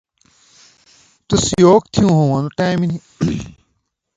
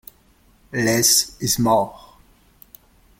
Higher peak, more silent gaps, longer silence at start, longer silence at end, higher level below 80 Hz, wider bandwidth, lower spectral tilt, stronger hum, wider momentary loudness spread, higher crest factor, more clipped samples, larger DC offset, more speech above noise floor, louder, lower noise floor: first, 0 dBFS vs -4 dBFS; neither; first, 1.3 s vs 0.75 s; second, 0.65 s vs 1.2 s; first, -42 dBFS vs -50 dBFS; second, 9.4 kHz vs 16.5 kHz; first, -6 dB/octave vs -2.5 dB/octave; neither; about the same, 11 LU vs 13 LU; about the same, 18 dB vs 20 dB; neither; neither; first, 55 dB vs 37 dB; about the same, -16 LUFS vs -18 LUFS; first, -69 dBFS vs -56 dBFS